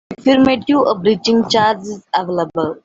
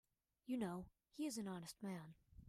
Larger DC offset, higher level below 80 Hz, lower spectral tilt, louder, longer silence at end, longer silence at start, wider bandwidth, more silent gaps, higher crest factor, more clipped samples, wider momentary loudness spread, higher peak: neither; first, -52 dBFS vs -74 dBFS; about the same, -5 dB/octave vs -5.5 dB/octave; first, -15 LUFS vs -49 LUFS; about the same, 0.1 s vs 0 s; second, 0.1 s vs 0.45 s; second, 7.8 kHz vs 15.5 kHz; neither; about the same, 14 dB vs 18 dB; neither; second, 8 LU vs 15 LU; first, -2 dBFS vs -32 dBFS